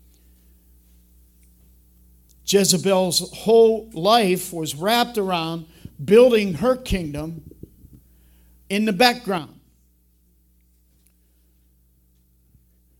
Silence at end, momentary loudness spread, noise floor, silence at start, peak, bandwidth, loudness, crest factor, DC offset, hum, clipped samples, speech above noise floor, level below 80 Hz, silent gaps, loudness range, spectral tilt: 3.55 s; 16 LU; -60 dBFS; 2.45 s; 0 dBFS; 17.5 kHz; -19 LUFS; 22 dB; under 0.1%; none; under 0.1%; 41 dB; -46 dBFS; none; 6 LU; -4 dB/octave